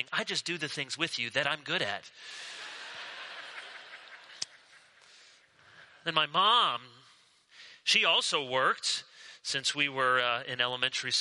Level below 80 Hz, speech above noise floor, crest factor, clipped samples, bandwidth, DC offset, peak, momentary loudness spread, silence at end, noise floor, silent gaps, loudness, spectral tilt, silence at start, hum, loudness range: -80 dBFS; 32 dB; 24 dB; under 0.1%; 11.5 kHz; under 0.1%; -10 dBFS; 19 LU; 0 s; -62 dBFS; none; -29 LUFS; -1.5 dB/octave; 0 s; none; 15 LU